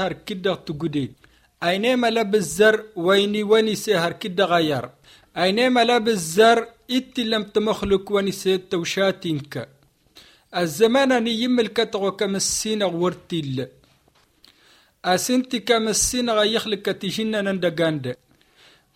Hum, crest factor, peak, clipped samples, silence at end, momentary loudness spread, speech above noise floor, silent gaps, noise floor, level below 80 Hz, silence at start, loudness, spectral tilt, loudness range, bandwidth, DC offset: none; 20 dB; -2 dBFS; under 0.1%; 0.8 s; 11 LU; 39 dB; none; -60 dBFS; -52 dBFS; 0 s; -21 LUFS; -3.5 dB/octave; 5 LU; 16.5 kHz; under 0.1%